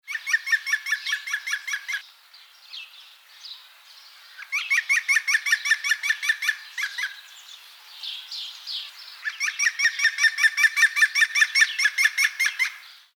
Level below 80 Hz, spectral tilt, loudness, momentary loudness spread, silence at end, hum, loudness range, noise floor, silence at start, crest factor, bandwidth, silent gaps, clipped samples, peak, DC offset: under -90 dBFS; 11.5 dB/octave; -22 LUFS; 22 LU; 0.2 s; none; 12 LU; -51 dBFS; 0.05 s; 20 dB; 19.5 kHz; none; under 0.1%; -6 dBFS; under 0.1%